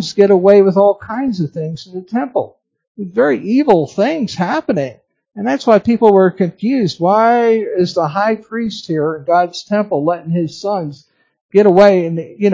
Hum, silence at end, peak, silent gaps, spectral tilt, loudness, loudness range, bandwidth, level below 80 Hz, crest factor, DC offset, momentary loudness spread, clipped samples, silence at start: none; 0 s; 0 dBFS; 2.87-2.95 s, 11.41-11.49 s; -7 dB/octave; -14 LUFS; 4 LU; 7.6 kHz; -56 dBFS; 14 dB; under 0.1%; 12 LU; 0.2%; 0 s